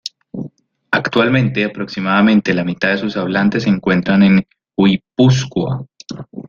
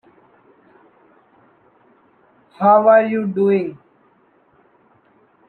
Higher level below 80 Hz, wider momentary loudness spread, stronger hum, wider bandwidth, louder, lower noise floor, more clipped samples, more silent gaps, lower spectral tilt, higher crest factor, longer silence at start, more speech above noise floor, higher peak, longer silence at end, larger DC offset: first, -50 dBFS vs -74 dBFS; first, 18 LU vs 9 LU; neither; first, 7.2 kHz vs 4.3 kHz; about the same, -15 LUFS vs -15 LUFS; second, -38 dBFS vs -57 dBFS; neither; neither; second, -6.5 dB/octave vs -10 dB/octave; about the same, 16 dB vs 18 dB; second, 0.05 s vs 2.6 s; second, 23 dB vs 42 dB; about the same, 0 dBFS vs -2 dBFS; second, 0.05 s vs 1.75 s; neither